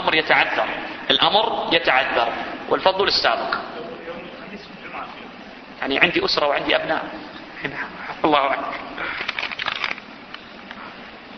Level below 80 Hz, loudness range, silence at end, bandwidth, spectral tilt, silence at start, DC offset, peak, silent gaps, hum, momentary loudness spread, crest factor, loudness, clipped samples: -54 dBFS; 6 LU; 0 s; 6.4 kHz; -4 dB/octave; 0 s; under 0.1%; 0 dBFS; none; none; 20 LU; 22 dB; -20 LUFS; under 0.1%